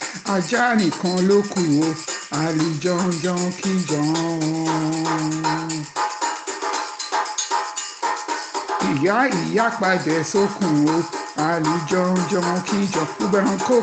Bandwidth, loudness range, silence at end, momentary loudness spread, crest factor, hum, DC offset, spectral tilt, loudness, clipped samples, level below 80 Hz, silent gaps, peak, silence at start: 9.4 kHz; 4 LU; 0 s; 7 LU; 16 dB; none; under 0.1%; -4.5 dB/octave; -21 LUFS; under 0.1%; -62 dBFS; none; -6 dBFS; 0 s